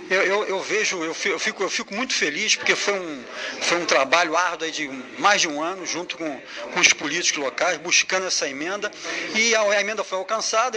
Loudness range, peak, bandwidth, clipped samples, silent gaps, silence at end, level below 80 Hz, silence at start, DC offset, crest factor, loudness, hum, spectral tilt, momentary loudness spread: 1 LU; 0 dBFS; 10.5 kHz; under 0.1%; none; 0 s; -68 dBFS; 0 s; under 0.1%; 22 dB; -21 LUFS; none; -0.5 dB/octave; 10 LU